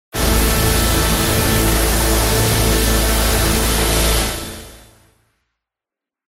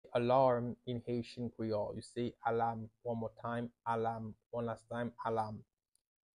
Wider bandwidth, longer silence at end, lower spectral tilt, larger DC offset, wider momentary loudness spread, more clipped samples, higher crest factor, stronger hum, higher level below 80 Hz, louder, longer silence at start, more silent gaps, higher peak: first, 16.5 kHz vs 11 kHz; first, 1.5 s vs 0.8 s; second, -3.5 dB/octave vs -7.5 dB/octave; neither; second, 3 LU vs 12 LU; neither; second, 14 dB vs 20 dB; neither; first, -22 dBFS vs -68 dBFS; first, -15 LUFS vs -38 LUFS; about the same, 0.15 s vs 0.05 s; second, none vs 4.46-4.50 s; first, -2 dBFS vs -18 dBFS